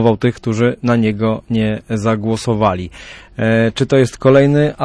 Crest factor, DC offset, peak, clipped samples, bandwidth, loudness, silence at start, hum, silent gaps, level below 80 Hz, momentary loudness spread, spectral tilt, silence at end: 12 dB; under 0.1%; -2 dBFS; under 0.1%; 11 kHz; -15 LUFS; 0 s; none; none; -42 dBFS; 8 LU; -7 dB/octave; 0 s